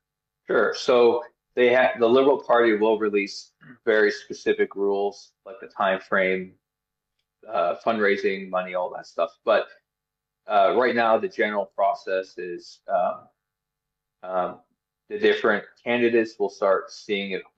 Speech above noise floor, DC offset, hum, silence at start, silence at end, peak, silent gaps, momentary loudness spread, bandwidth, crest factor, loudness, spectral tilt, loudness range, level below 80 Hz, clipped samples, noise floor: 62 dB; under 0.1%; none; 0.5 s; 0.15 s; -8 dBFS; none; 13 LU; 8 kHz; 16 dB; -23 LUFS; -5 dB/octave; 6 LU; -74 dBFS; under 0.1%; -85 dBFS